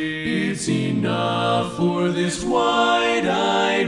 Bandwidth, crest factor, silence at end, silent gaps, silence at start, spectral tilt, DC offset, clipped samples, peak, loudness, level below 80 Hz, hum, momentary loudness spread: 11.5 kHz; 14 dB; 0 s; none; 0 s; -5 dB/octave; under 0.1%; under 0.1%; -6 dBFS; -20 LUFS; -50 dBFS; none; 5 LU